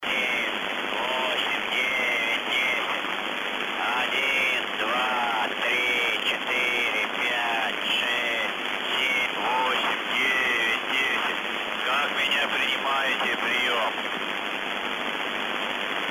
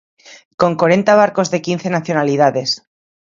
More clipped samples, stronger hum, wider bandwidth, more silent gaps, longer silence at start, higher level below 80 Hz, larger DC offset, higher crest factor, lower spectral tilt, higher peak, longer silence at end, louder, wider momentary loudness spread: neither; neither; first, 16 kHz vs 7.6 kHz; second, none vs 0.45-0.58 s; second, 0 s vs 0.3 s; about the same, -64 dBFS vs -60 dBFS; neither; about the same, 14 dB vs 16 dB; second, -1.5 dB/octave vs -5 dB/octave; second, -12 dBFS vs 0 dBFS; second, 0 s vs 0.55 s; second, -24 LUFS vs -15 LUFS; second, 5 LU vs 8 LU